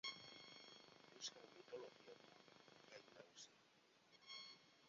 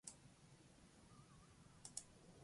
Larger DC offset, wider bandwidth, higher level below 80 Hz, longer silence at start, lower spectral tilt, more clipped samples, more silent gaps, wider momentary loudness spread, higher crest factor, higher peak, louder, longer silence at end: neither; second, 7.4 kHz vs 11.5 kHz; second, under -90 dBFS vs -78 dBFS; about the same, 0.05 s vs 0.05 s; second, 0 dB/octave vs -2.5 dB/octave; neither; neither; about the same, 13 LU vs 13 LU; about the same, 26 dB vs 30 dB; second, -36 dBFS vs -32 dBFS; about the same, -59 LUFS vs -61 LUFS; about the same, 0 s vs 0 s